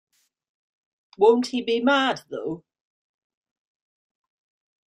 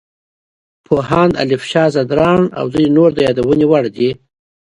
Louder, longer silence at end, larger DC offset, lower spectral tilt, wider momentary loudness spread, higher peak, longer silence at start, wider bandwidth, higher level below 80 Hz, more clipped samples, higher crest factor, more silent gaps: second, -22 LUFS vs -13 LUFS; first, 2.3 s vs 0.65 s; neither; second, -4 dB/octave vs -7 dB/octave; first, 14 LU vs 7 LU; second, -6 dBFS vs 0 dBFS; first, 1.2 s vs 0.9 s; about the same, 11 kHz vs 11 kHz; second, -72 dBFS vs -44 dBFS; neither; first, 20 dB vs 14 dB; neither